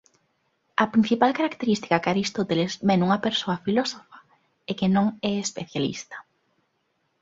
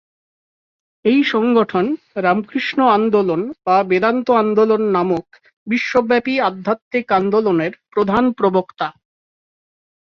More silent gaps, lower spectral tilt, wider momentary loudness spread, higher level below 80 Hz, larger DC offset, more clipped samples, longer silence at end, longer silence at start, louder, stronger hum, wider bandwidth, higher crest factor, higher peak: second, none vs 5.53-5.66 s, 6.82-6.91 s; second, -5 dB/octave vs -7 dB/octave; first, 12 LU vs 7 LU; about the same, -62 dBFS vs -58 dBFS; neither; neither; second, 1 s vs 1.15 s; second, 0.8 s vs 1.05 s; second, -24 LUFS vs -17 LUFS; neither; first, 7.8 kHz vs 6.8 kHz; first, 22 dB vs 16 dB; about the same, -4 dBFS vs -2 dBFS